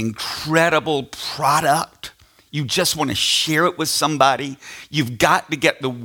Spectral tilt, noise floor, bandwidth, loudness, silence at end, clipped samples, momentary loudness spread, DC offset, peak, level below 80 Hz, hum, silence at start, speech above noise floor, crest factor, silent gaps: -3 dB/octave; -40 dBFS; 18 kHz; -18 LUFS; 0 s; under 0.1%; 13 LU; under 0.1%; 0 dBFS; -54 dBFS; none; 0 s; 21 dB; 20 dB; none